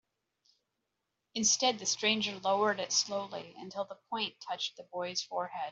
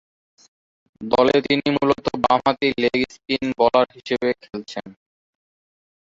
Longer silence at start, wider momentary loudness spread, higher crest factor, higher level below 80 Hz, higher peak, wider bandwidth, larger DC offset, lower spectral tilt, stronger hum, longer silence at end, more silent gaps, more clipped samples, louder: first, 1.35 s vs 1 s; about the same, 13 LU vs 14 LU; about the same, 20 dB vs 20 dB; second, -80 dBFS vs -54 dBFS; second, -14 dBFS vs -2 dBFS; about the same, 8.2 kHz vs 7.8 kHz; neither; second, -1 dB/octave vs -5.5 dB/octave; neither; second, 0 s vs 1.2 s; neither; neither; second, -32 LUFS vs -20 LUFS